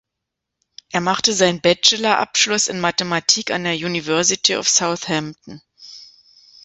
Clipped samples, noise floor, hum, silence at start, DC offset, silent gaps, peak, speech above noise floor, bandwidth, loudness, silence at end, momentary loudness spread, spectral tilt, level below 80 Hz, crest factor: under 0.1%; -81 dBFS; none; 0.95 s; under 0.1%; none; 0 dBFS; 62 dB; 8.4 kHz; -17 LUFS; 0.6 s; 9 LU; -2 dB/octave; -60 dBFS; 20 dB